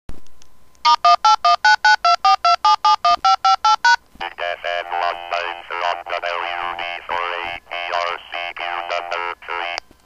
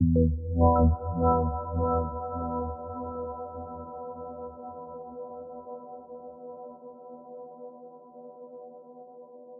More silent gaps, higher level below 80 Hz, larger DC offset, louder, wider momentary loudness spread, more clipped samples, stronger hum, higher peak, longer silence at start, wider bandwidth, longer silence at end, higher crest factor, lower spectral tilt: neither; second, -52 dBFS vs -38 dBFS; neither; first, -18 LUFS vs -29 LUFS; second, 13 LU vs 23 LU; neither; neither; first, -2 dBFS vs -10 dBFS; about the same, 0.1 s vs 0 s; first, 11 kHz vs 1.5 kHz; first, 0.25 s vs 0 s; about the same, 18 dB vs 20 dB; second, 0 dB/octave vs -3.5 dB/octave